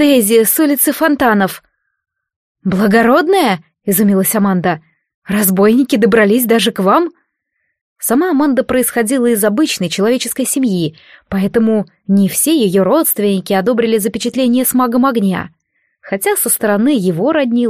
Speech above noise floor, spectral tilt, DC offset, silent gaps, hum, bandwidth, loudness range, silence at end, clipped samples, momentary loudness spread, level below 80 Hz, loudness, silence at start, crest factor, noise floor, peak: 57 dB; -4.5 dB/octave; under 0.1%; 2.36-2.55 s, 5.14-5.22 s, 7.81-7.96 s; none; 15.5 kHz; 2 LU; 0 s; under 0.1%; 8 LU; -50 dBFS; -13 LUFS; 0 s; 14 dB; -69 dBFS; 0 dBFS